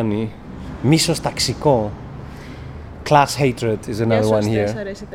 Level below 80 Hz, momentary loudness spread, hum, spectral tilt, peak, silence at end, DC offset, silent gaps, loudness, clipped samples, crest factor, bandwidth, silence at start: -40 dBFS; 19 LU; none; -5 dB/octave; 0 dBFS; 0 s; under 0.1%; none; -18 LUFS; under 0.1%; 20 dB; 16.5 kHz; 0 s